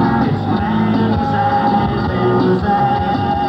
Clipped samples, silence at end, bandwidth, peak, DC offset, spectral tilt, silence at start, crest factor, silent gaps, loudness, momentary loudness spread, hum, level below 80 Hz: under 0.1%; 0 s; 6.2 kHz; -4 dBFS; under 0.1%; -9 dB/octave; 0 s; 10 dB; none; -15 LUFS; 3 LU; none; -34 dBFS